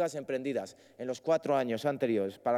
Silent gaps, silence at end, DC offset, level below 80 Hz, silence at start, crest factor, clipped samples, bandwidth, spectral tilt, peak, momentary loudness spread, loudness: none; 0 s; under 0.1%; -84 dBFS; 0 s; 14 dB; under 0.1%; 15.5 kHz; -6 dB/octave; -16 dBFS; 10 LU; -32 LUFS